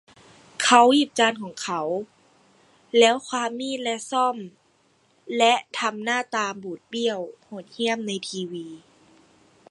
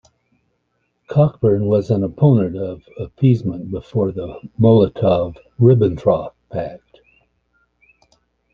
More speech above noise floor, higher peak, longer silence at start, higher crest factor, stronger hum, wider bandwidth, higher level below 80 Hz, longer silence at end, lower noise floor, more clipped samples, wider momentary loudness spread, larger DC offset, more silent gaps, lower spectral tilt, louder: second, 40 dB vs 52 dB; about the same, -2 dBFS vs -2 dBFS; second, 0.6 s vs 1.1 s; first, 24 dB vs 16 dB; second, none vs 60 Hz at -40 dBFS; first, 11.5 kHz vs 6.4 kHz; second, -76 dBFS vs -48 dBFS; second, 0.95 s vs 1.75 s; second, -63 dBFS vs -69 dBFS; neither; first, 19 LU vs 15 LU; neither; neither; second, -2.5 dB/octave vs -10.5 dB/octave; second, -23 LUFS vs -17 LUFS